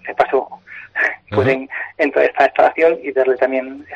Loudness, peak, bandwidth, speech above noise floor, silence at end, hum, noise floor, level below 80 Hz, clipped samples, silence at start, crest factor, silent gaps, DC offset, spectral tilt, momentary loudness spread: -17 LUFS; -2 dBFS; 7.8 kHz; 21 dB; 0 s; none; -36 dBFS; -56 dBFS; under 0.1%; 0.05 s; 16 dB; none; under 0.1%; -7 dB/octave; 11 LU